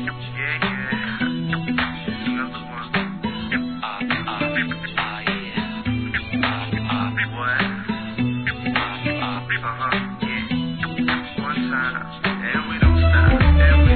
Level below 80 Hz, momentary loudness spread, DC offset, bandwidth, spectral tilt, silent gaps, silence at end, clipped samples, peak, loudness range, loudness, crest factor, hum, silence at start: -26 dBFS; 10 LU; 0.4%; 4.5 kHz; -9.5 dB/octave; none; 0 s; under 0.1%; -4 dBFS; 4 LU; -22 LUFS; 18 dB; none; 0 s